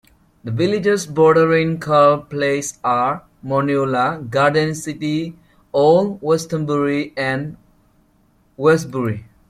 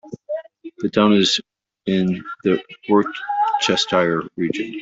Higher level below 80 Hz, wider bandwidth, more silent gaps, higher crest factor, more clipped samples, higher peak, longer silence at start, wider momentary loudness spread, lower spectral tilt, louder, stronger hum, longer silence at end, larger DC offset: first, -54 dBFS vs -60 dBFS; first, 14.5 kHz vs 8 kHz; neither; about the same, 16 dB vs 18 dB; neither; about the same, -2 dBFS vs -2 dBFS; first, 0.45 s vs 0.05 s; second, 10 LU vs 14 LU; first, -6 dB/octave vs -4.5 dB/octave; about the same, -18 LUFS vs -20 LUFS; neither; first, 0.3 s vs 0 s; neither